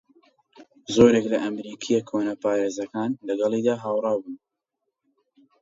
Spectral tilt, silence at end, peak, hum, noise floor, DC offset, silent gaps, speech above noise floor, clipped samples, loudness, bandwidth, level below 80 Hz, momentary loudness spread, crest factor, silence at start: -5.5 dB/octave; 1.25 s; -4 dBFS; none; -81 dBFS; under 0.1%; none; 58 dB; under 0.1%; -24 LUFS; 7.8 kHz; -60 dBFS; 14 LU; 22 dB; 0.6 s